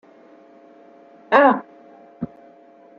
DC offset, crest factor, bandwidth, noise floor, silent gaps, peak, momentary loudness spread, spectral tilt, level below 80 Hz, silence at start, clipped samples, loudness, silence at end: under 0.1%; 22 dB; 6.8 kHz; -49 dBFS; none; 0 dBFS; 20 LU; -3 dB/octave; -66 dBFS; 1.3 s; under 0.1%; -17 LUFS; 0.75 s